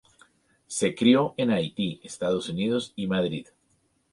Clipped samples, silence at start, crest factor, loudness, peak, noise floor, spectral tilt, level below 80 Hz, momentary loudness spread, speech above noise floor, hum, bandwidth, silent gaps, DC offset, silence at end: under 0.1%; 0.7 s; 20 dB; -26 LUFS; -6 dBFS; -69 dBFS; -5 dB/octave; -62 dBFS; 11 LU; 44 dB; none; 11.5 kHz; none; under 0.1%; 0.7 s